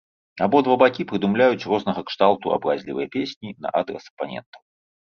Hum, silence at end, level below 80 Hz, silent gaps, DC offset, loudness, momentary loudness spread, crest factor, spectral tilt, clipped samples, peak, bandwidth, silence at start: none; 0.5 s; -62 dBFS; 3.36-3.41 s, 4.10-4.17 s, 4.46-4.53 s; under 0.1%; -22 LUFS; 14 LU; 20 dB; -7 dB/octave; under 0.1%; -2 dBFS; 6.8 kHz; 0.35 s